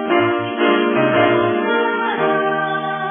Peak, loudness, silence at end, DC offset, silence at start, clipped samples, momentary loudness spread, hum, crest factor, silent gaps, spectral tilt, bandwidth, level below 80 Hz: -2 dBFS; -17 LUFS; 0 s; under 0.1%; 0 s; under 0.1%; 4 LU; none; 14 dB; none; -3.5 dB/octave; 3.7 kHz; -62 dBFS